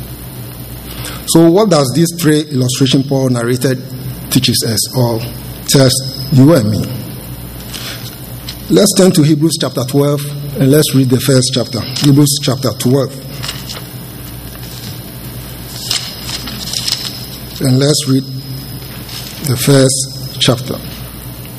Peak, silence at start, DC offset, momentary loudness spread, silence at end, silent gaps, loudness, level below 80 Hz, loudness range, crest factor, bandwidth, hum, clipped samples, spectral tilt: 0 dBFS; 0 s; under 0.1%; 18 LU; 0 s; none; -12 LUFS; -38 dBFS; 8 LU; 14 dB; 16 kHz; none; 0.3%; -5 dB/octave